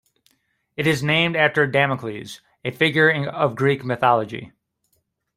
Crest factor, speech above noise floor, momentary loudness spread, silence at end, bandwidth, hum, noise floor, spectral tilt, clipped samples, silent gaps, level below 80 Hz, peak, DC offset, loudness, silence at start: 20 dB; 50 dB; 15 LU; 0.9 s; 16 kHz; none; -70 dBFS; -5.5 dB/octave; under 0.1%; none; -60 dBFS; -2 dBFS; under 0.1%; -19 LUFS; 0.8 s